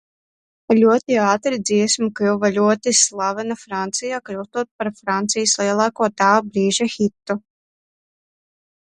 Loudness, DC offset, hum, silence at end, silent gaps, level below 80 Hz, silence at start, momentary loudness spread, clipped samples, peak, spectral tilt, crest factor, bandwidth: -19 LUFS; under 0.1%; none; 1.45 s; 4.71-4.79 s; -64 dBFS; 0.7 s; 11 LU; under 0.1%; -2 dBFS; -3 dB/octave; 18 dB; 11.5 kHz